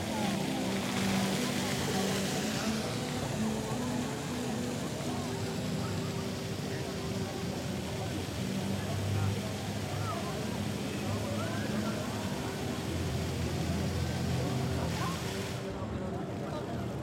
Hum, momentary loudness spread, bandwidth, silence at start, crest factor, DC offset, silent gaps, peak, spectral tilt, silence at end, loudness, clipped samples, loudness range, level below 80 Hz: none; 5 LU; 16.5 kHz; 0 s; 16 dB; under 0.1%; none; -18 dBFS; -5 dB/octave; 0 s; -34 LUFS; under 0.1%; 3 LU; -50 dBFS